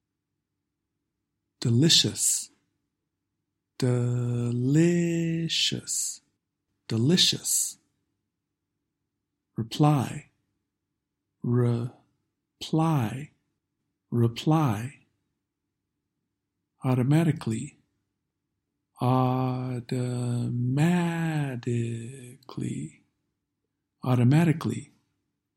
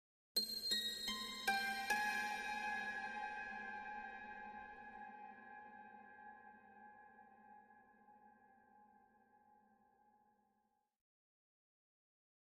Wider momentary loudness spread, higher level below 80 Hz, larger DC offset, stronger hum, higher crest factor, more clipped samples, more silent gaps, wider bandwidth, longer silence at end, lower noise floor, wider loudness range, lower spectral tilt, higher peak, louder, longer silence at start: second, 16 LU vs 23 LU; first, -66 dBFS vs -78 dBFS; neither; neither; about the same, 20 dB vs 24 dB; neither; neither; first, 16 kHz vs 14.5 kHz; second, 0.75 s vs 3 s; about the same, -84 dBFS vs -84 dBFS; second, 5 LU vs 23 LU; first, -4.5 dB/octave vs -0.5 dB/octave; first, -8 dBFS vs -24 dBFS; first, -26 LUFS vs -42 LUFS; first, 1.6 s vs 0.35 s